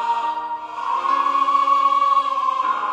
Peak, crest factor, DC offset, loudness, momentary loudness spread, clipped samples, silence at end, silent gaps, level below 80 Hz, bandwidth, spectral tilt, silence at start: -6 dBFS; 14 dB; under 0.1%; -19 LUFS; 10 LU; under 0.1%; 0 s; none; -72 dBFS; 9.4 kHz; -1.5 dB/octave; 0 s